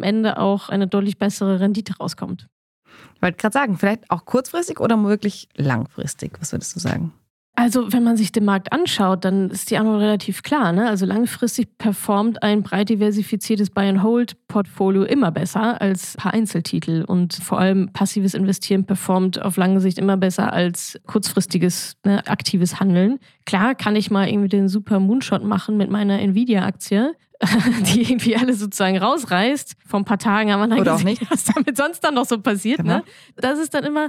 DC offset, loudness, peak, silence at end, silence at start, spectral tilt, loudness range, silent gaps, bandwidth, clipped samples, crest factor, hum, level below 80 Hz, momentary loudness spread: under 0.1%; -19 LUFS; -4 dBFS; 0 s; 0 s; -5.5 dB/octave; 3 LU; 2.52-2.82 s, 7.30-7.53 s; 15.5 kHz; under 0.1%; 14 dB; none; -60 dBFS; 7 LU